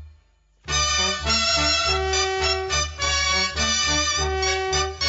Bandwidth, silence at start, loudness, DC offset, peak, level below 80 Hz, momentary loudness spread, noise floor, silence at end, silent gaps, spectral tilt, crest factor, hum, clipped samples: 8 kHz; 0 s; -20 LUFS; under 0.1%; -8 dBFS; -34 dBFS; 4 LU; -58 dBFS; 0 s; none; -1.5 dB/octave; 14 dB; none; under 0.1%